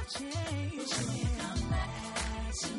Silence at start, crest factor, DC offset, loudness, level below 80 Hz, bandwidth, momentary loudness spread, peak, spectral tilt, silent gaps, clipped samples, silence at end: 0 s; 14 dB; under 0.1%; -35 LUFS; -40 dBFS; 11.5 kHz; 3 LU; -22 dBFS; -4 dB/octave; none; under 0.1%; 0 s